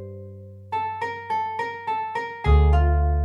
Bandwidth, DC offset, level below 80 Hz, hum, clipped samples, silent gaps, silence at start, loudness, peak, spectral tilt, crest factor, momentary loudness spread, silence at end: 5.4 kHz; under 0.1%; -24 dBFS; 50 Hz at -60 dBFS; under 0.1%; none; 0 s; -24 LUFS; -6 dBFS; -8 dB/octave; 16 dB; 20 LU; 0 s